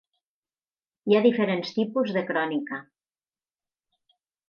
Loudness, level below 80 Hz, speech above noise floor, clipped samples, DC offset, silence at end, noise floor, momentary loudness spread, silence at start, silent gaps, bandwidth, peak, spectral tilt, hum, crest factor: -25 LUFS; -80 dBFS; over 66 dB; under 0.1%; under 0.1%; 1.65 s; under -90 dBFS; 15 LU; 1.05 s; none; 6.8 kHz; -8 dBFS; -7 dB/octave; none; 20 dB